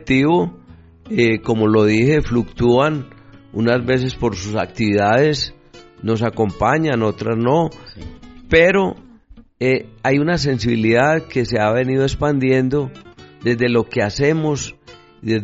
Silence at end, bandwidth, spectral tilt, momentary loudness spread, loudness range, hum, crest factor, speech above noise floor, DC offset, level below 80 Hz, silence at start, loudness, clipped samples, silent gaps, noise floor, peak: 0 s; 8 kHz; -5.5 dB/octave; 11 LU; 2 LU; none; 16 dB; 28 dB; under 0.1%; -40 dBFS; 0 s; -17 LUFS; under 0.1%; none; -45 dBFS; -2 dBFS